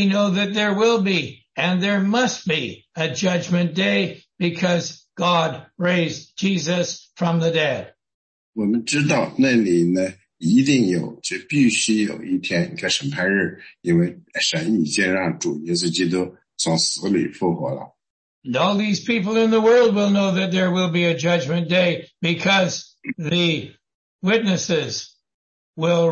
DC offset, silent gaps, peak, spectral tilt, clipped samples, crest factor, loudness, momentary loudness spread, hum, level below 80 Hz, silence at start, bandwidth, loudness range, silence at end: under 0.1%; 8.14-8.53 s, 18.10-18.42 s, 23.94-24.19 s, 25.34-25.74 s; -4 dBFS; -4.5 dB/octave; under 0.1%; 16 dB; -20 LUFS; 10 LU; none; -62 dBFS; 0 s; 8.8 kHz; 4 LU; 0 s